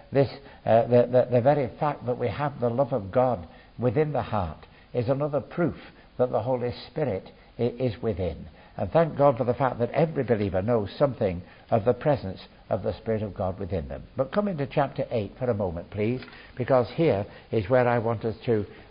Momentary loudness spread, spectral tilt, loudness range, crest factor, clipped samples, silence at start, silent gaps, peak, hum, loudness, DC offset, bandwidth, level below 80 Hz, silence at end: 12 LU; -12 dB/octave; 4 LU; 18 dB; under 0.1%; 0.1 s; none; -8 dBFS; none; -26 LUFS; under 0.1%; 5.4 kHz; -48 dBFS; 0.05 s